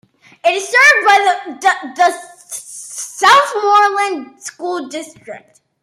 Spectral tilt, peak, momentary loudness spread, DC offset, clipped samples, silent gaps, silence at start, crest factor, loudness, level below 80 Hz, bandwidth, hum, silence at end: 0 dB/octave; 0 dBFS; 20 LU; under 0.1%; under 0.1%; none; 0.45 s; 14 dB; -12 LUFS; -72 dBFS; 16 kHz; none; 0.45 s